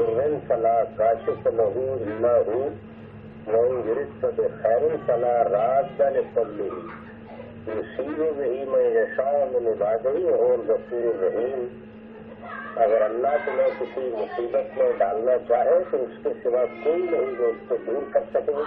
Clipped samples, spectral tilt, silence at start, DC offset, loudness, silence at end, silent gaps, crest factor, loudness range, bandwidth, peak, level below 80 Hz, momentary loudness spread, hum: under 0.1%; -6 dB/octave; 0 s; under 0.1%; -24 LUFS; 0 s; none; 14 dB; 3 LU; 4 kHz; -8 dBFS; -60 dBFS; 14 LU; none